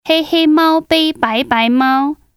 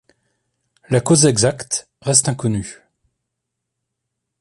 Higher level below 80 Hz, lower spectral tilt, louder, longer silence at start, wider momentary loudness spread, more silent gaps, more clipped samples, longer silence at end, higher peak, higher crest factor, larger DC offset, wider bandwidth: about the same, -50 dBFS vs -50 dBFS; about the same, -4 dB/octave vs -4 dB/octave; first, -13 LUFS vs -17 LUFS; second, 0.05 s vs 0.9 s; second, 4 LU vs 11 LU; neither; neither; second, 0.25 s vs 1.65 s; about the same, 0 dBFS vs 0 dBFS; second, 14 dB vs 20 dB; neither; first, 15 kHz vs 11.5 kHz